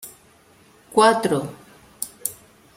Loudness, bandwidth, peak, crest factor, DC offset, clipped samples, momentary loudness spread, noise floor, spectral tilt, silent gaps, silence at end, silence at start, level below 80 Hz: -21 LUFS; 16.5 kHz; -2 dBFS; 22 dB; under 0.1%; under 0.1%; 18 LU; -54 dBFS; -3.5 dB/octave; none; 0.45 s; 0 s; -64 dBFS